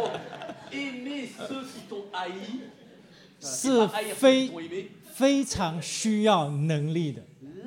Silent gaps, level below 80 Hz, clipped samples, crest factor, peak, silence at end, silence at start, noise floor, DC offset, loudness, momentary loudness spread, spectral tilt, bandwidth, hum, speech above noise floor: none; -60 dBFS; under 0.1%; 20 dB; -8 dBFS; 0 s; 0 s; -53 dBFS; under 0.1%; -27 LUFS; 17 LU; -4.5 dB/octave; 16.5 kHz; none; 27 dB